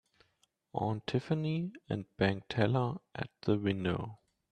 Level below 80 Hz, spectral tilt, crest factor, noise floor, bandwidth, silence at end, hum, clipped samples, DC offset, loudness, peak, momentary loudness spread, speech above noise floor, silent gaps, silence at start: -64 dBFS; -8 dB/octave; 20 dB; -75 dBFS; 9.4 kHz; 0.4 s; none; under 0.1%; under 0.1%; -34 LUFS; -14 dBFS; 10 LU; 42 dB; none; 0.75 s